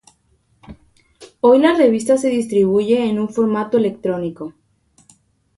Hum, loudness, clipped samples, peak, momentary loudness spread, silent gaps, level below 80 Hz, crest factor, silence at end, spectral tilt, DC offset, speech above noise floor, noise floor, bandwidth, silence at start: none; -16 LUFS; under 0.1%; -2 dBFS; 11 LU; none; -56 dBFS; 16 dB; 1.05 s; -6 dB/octave; under 0.1%; 45 dB; -60 dBFS; 11.5 kHz; 0.7 s